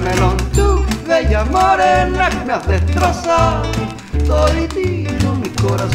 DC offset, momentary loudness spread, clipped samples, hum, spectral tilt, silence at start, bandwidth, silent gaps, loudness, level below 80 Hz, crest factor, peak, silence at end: under 0.1%; 6 LU; under 0.1%; none; -6 dB/octave; 0 s; 15.5 kHz; none; -15 LUFS; -20 dBFS; 14 dB; 0 dBFS; 0 s